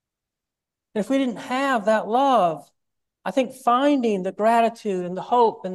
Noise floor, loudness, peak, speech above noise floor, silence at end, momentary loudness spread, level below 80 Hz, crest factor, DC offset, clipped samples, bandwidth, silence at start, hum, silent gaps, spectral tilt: -87 dBFS; -22 LUFS; -6 dBFS; 66 dB; 0 s; 9 LU; -74 dBFS; 16 dB; under 0.1%; under 0.1%; 12.5 kHz; 0.95 s; none; none; -5.5 dB/octave